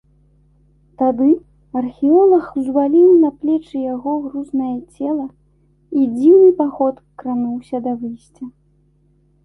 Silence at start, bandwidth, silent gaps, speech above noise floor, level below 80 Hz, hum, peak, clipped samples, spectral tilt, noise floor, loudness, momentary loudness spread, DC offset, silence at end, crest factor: 1 s; 4 kHz; none; 41 dB; -56 dBFS; none; -2 dBFS; under 0.1%; -9 dB/octave; -57 dBFS; -16 LUFS; 16 LU; under 0.1%; 0.95 s; 14 dB